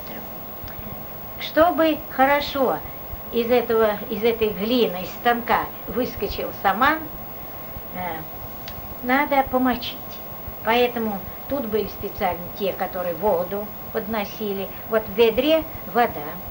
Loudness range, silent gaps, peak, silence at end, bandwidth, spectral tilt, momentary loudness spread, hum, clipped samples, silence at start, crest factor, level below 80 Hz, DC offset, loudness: 4 LU; none; -4 dBFS; 0 s; 19 kHz; -5.5 dB/octave; 13 LU; none; under 0.1%; 0 s; 20 dB; -46 dBFS; under 0.1%; -23 LUFS